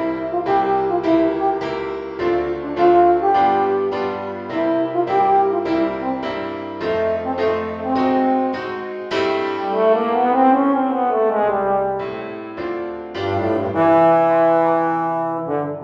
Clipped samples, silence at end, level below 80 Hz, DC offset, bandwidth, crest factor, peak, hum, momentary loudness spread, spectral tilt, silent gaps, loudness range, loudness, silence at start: under 0.1%; 0 s; -52 dBFS; under 0.1%; 7.4 kHz; 14 dB; -4 dBFS; none; 11 LU; -7.5 dB/octave; none; 3 LU; -19 LUFS; 0 s